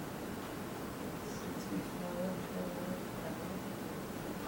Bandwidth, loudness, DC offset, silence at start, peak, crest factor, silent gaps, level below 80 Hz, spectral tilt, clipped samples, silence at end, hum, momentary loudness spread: over 20 kHz; -41 LUFS; under 0.1%; 0 s; -28 dBFS; 14 dB; none; -60 dBFS; -5.5 dB/octave; under 0.1%; 0 s; none; 3 LU